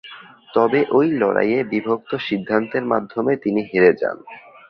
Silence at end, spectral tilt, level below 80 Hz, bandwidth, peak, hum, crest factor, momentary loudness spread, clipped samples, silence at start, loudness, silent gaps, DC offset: 0.3 s; -8.5 dB/octave; -60 dBFS; 5.8 kHz; -2 dBFS; none; 18 dB; 8 LU; under 0.1%; 0.05 s; -19 LUFS; none; under 0.1%